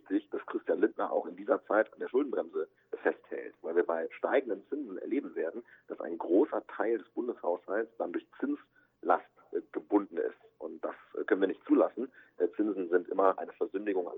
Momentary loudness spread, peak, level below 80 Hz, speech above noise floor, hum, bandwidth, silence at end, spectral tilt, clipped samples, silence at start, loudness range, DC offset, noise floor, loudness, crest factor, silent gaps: 12 LU; -12 dBFS; -86 dBFS; 23 dB; none; 3.9 kHz; 0 s; -8.5 dB/octave; under 0.1%; 0.05 s; 3 LU; under 0.1%; -55 dBFS; -33 LUFS; 22 dB; none